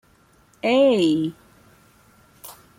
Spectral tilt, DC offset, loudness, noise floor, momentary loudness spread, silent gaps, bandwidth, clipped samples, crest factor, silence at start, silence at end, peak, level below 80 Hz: -5.5 dB/octave; under 0.1%; -20 LUFS; -57 dBFS; 25 LU; none; 16.5 kHz; under 0.1%; 16 dB; 0.65 s; 0.25 s; -8 dBFS; -64 dBFS